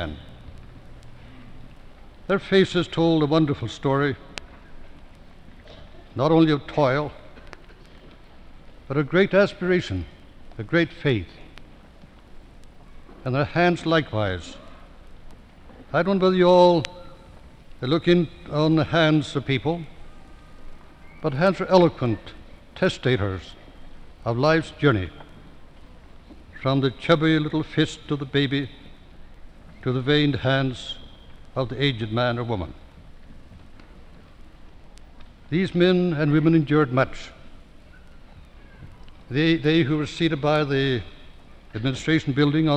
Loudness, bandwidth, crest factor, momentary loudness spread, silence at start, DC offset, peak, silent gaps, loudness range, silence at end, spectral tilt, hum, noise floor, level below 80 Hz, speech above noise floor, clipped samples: -22 LUFS; 9.4 kHz; 22 dB; 17 LU; 0 s; under 0.1%; -2 dBFS; none; 5 LU; 0 s; -7 dB/octave; none; -47 dBFS; -46 dBFS; 26 dB; under 0.1%